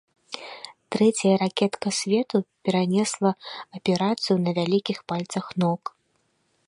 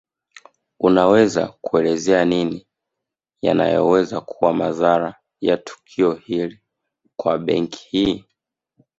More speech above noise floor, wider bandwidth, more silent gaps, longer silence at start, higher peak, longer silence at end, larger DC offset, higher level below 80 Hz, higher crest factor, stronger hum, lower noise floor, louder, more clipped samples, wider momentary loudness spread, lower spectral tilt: second, 46 dB vs 65 dB; first, 11.5 kHz vs 8 kHz; neither; second, 0.3 s vs 0.8 s; second, -6 dBFS vs -2 dBFS; about the same, 0.8 s vs 0.8 s; neither; second, -70 dBFS vs -54 dBFS; about the same, 18 dB vs 18 dB; neither; second, -70 dBFS vs -83 dBFS; second, -24 LUFS vs -19 LUFS; neither; first, 15 LU vs 10 LU; about the same, -5.5 dB/octave vs -6 dB/octave